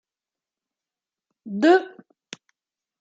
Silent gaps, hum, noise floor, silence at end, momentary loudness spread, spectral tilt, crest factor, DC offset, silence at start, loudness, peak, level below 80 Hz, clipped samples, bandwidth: none; none; under -90 dBFS; 1.15 s; 25 LU; -5.5 dB/octave; 22 dB; under 0.1%; 1.45 s; -19 LUFS; -6 dBFS; -82 dBFS; under 0.1%; 7.8 kHz